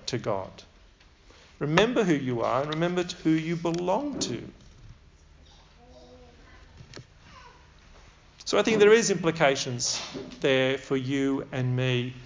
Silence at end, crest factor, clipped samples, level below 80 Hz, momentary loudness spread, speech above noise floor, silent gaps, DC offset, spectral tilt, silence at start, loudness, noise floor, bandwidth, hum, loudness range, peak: 0 s; 22 dB; under 0.1%; -56 dBFS; 17 LU; 30 dB; none; under 0.1%; -4.5 dB/octave; 0.05 s; -26 LUFS; -56 dBFS; 7.6 kHz; none; 11 LU; -6 dBFS